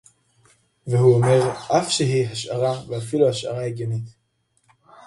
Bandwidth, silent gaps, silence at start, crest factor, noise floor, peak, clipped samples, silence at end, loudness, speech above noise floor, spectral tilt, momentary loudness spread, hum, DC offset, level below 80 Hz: 11.5 kHz; none; 0.85 s; 18 dB; -68 dBFS; -4 dBFS; under 0.1%; 0.95 s; -21 LUFS; 48 dB; -5.5 dB/octave; 12 LU; none; under 0.1%; -58 dBFS